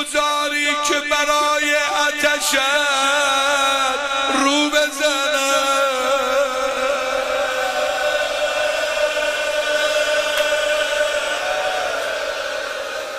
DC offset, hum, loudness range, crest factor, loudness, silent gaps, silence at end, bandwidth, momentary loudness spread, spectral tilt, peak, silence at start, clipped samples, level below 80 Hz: under 0.1%; none; 3 LU; 16 dB; -18 LUFS; none; 0 s; 15.5 kHz; 5 LU; 0 dB/octave; -4 dBFS; 0 s; under 0.1%; -52 dBFS